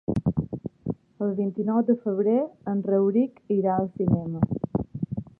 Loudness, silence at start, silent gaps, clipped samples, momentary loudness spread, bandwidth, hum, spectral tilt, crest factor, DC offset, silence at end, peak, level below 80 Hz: -26 LUFS; 0.1 s; none; under 0.1%; 10 LU; 3.2 kHz; none; -12 dB/octave; 16 dB; under 0.1%; 0.1 s; -8 dBFS; -50 dBFS